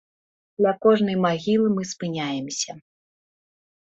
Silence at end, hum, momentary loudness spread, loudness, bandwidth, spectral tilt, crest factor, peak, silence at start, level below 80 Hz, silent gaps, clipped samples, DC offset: 1.1 s; none; 10 LU; -23 LUFS; 8.2 kHz; -5 dB/octave; 20 dB; -4 dBFS; 0.6 s; -66 dBFS; none; under 0.1%; under 0.1%